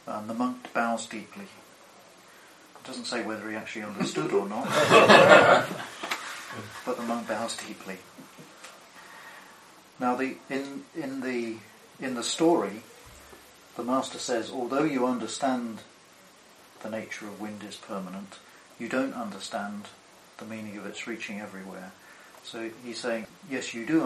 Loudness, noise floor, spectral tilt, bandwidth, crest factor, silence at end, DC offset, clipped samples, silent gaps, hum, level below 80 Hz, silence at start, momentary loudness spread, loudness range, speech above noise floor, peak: -27 LUFS; -55 dBFS; -4 dB/octave; 13 kHz; 28 dB; 0 s; under 0.1%; under 0.1%; none; none; -72 dBFS; 0.05 s; 21 LU; 16 LU; 27 dB; -2 dBFS